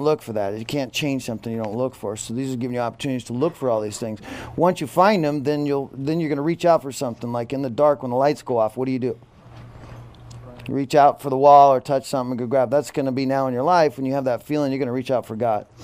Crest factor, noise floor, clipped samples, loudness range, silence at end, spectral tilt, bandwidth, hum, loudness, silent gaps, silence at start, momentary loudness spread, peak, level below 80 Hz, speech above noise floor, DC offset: 20 dB; -42 dBFS; under 0.1%; 7 LU; 0 s; -6 dB/octave; 15.5 kHz; none; -21 LUFS; none; 0 s; 12 LU; -2 dBFS; -56 dBFS; 22 dB; under 0.1%